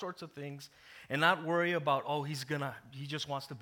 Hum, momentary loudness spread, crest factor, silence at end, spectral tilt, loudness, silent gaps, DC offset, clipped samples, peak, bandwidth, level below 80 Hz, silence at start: none; 17 LU; 22 dB; 0 s; -5 dB/octave; -34 LUFS; none; under 0.1%; under 0.1%; -12 dBFS; 19 kHz; -78 dBFS; 0 s